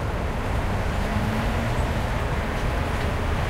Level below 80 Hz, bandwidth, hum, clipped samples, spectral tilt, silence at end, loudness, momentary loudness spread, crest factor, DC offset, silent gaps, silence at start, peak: -28 dBFS; 16 kHz; none; under 0.1%; -6 dB/octave; 0 s; -26 LUFS; 2 LU; 12 dB; under 0.1%; none; 0 s; -12 dBFS